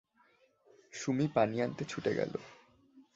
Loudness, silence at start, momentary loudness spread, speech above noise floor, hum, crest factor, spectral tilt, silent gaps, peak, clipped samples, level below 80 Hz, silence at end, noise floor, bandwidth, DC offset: -34 LUFS; 0.95 s; 15 LU; 36 dB; none; 22 dB; -6 dB/octave; none; -14 dBFS; under 0.1%; -72 dBFS; 0.15 s; -69 dBFS; 8 kHz; under 0.1%